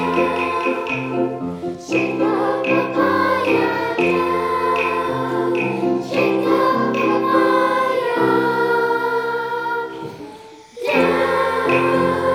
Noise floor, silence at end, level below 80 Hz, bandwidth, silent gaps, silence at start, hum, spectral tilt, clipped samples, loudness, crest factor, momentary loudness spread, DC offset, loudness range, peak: -39 dBFS; 0 s; -58 dBFS; 16 kHz; none; 0 s; none; -6 dB/octave; under 0.1%; -18 LUFS; 16 dB; 7 LU; under 0.1%; 3 LU; -4 dBFS